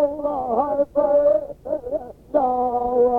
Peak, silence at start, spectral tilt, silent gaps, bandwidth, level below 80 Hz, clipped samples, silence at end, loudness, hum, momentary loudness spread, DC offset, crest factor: -6 dBFS; 0 s; -9 dB/octave; none; 3.3 kHz; -50 dBFS; under 0.1%; 0 s; -21 LUFS; none; 11 LU; under 0.1%; 14 dB